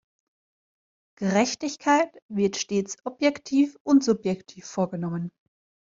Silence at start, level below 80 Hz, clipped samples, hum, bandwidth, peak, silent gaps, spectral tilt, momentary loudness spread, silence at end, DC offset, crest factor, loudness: 1.2 s; -66 dBFS; under 0.1%; none; 7.6 kHz; -8 dBFS; 2.22-2.29 s, 3.80-3.85 s; -5 dB/octave; 12 LU; 0.6 s; under 0.1%; 18 dB; -25 LUFS